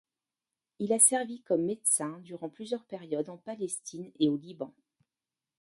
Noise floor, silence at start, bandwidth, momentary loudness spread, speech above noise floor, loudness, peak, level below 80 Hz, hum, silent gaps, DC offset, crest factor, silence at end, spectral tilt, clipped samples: under -90 dBFS; 0.8 s; 12 kHz; 20 LU; over 59 dB; -29 LUFS; -6 dBFS; -78 dBFS; none; none; under 0.1%; 26 dB; 0.9 s; -3.5 dB/octave; under 0.1%